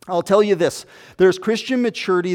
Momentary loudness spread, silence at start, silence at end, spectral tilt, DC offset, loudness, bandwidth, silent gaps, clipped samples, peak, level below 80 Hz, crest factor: 6 LU; 0.05 s; 0 s; -5 dB/octave; under 0.1%; -18 LUFS; 15.5 kHz; none; under 0.1%; -2 dBFS; -60 dBFS; 16 dB